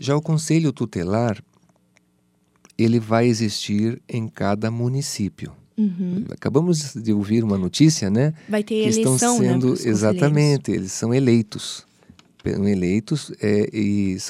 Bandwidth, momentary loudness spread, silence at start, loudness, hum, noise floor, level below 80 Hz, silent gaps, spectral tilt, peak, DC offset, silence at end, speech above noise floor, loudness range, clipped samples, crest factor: 15 kHz; 10 LU; 0 s; -21 LUFS; none; -63 dBFS; -58 dBFS; none; -6 dB/octave; -2 dBFS; under 0.1%; 0 s; 43 dB; 4 LU; under 0.1%; 18 dB